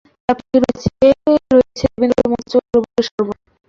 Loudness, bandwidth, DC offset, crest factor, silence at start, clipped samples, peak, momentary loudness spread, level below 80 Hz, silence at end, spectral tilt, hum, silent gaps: -16 LUFS; 7.6 kHz; under 0.1%; 14 dB; 0.3 s; under 0.1%; -2 dBFS; 8 LU; -40 dBFS; 0.35 s; -6.5 dB/octave; none; 3.11-3.18 s